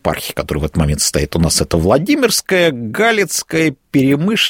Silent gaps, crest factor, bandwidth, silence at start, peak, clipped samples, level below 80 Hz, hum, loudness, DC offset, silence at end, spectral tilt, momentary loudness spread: none; 14 dB; 17 kHz; 0.05 s; 0 dBFS; under 0.1%; -30 dBFS; none; -15 LUFS; under 0.1%; 0 s; -4 dB/octave; 6 LU